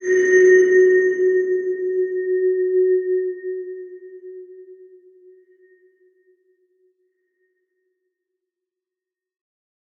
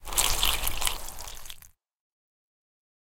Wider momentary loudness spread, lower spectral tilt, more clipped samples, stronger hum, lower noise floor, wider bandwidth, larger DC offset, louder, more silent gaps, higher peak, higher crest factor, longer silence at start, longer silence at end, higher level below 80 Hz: first, 26 LU vs 20 LU; first, -4.5 dB/octave vs 0 dB/octave; neither; neither; first, -88 dBFS vs -51 dBFS; second, 6.8 kHz vs 17 kHz; neither; first, -17 LUFS vs -26 LUFS; second, none vs 2.00-2.11 s; about the same, -4 dBFS vs -4 dBFS; second, 16 dB vs 26 dB; about the same, 0 s vs 0.05 s; first, 5.25 s vs 0.85 s; second, -84 dBFS vs -38 dBFS